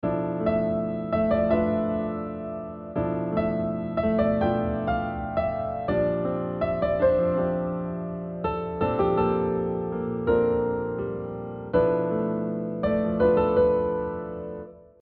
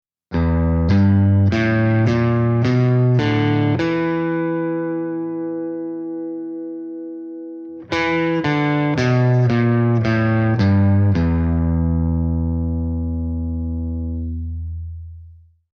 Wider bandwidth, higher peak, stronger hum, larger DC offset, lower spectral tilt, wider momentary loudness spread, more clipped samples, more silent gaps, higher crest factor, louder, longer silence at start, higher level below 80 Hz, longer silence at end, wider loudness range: second, 5 kHz vs 6.8 kHz; second, -10 dBFS vs -6 dBFS; neither; neither; about the same, -7.5 dB/octave vs -8.5 dB/octave; second, 11 LU vs 14 LU; neither; neither; about the same, 16 dB vs 12 dB; second, -26 LUFS vs -19 LUFS; second, 0.05 s vs 0.3 s; second, -46 dBFS vs -32 dBFS; second, 0.2 s vs 0.4 s; second, 2 LU vs 8 LU